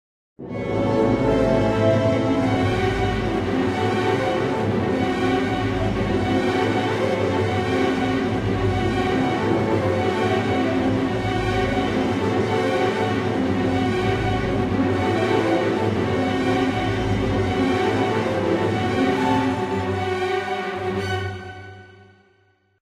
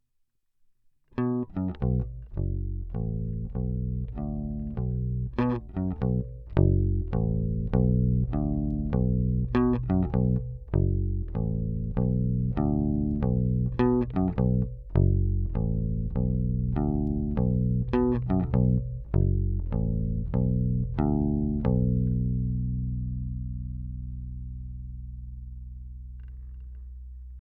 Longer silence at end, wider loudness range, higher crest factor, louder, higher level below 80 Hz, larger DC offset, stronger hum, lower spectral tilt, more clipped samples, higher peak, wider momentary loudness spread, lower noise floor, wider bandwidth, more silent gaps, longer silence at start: first, 0.9 s vs 0.1 s; second, 1 LU vs 6 LU; second, 14 dB vs 20 dB; first, -21 LUFS vs -28 LUFS; second, -40 dBFS vs -34 dBFS; neither; neither; second, -6.5 dB/octave vs -12.5 dB/octave; neither; about the same, -6 dBFS vs -8 dBFS; second, 4 LU vs 15 LU; second, -61 dBFS vs -72 dBFS; first, 12.5 kHz vs 4.3 kHz; neither; second, 0.4 s vs 1.15 s